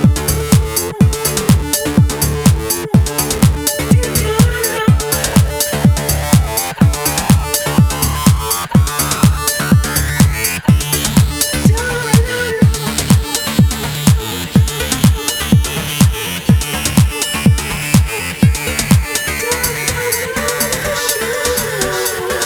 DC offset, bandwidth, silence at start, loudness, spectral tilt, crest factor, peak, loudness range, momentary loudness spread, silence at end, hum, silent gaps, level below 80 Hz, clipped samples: under 0.1%; over 20 kHz; 0 s; -14 LUFS; -4.5 dB/octave; 14 dB; 0 dBFS; 1 LU; 4 LU; 0 s; none; none; -22 dBFS; under 0.1%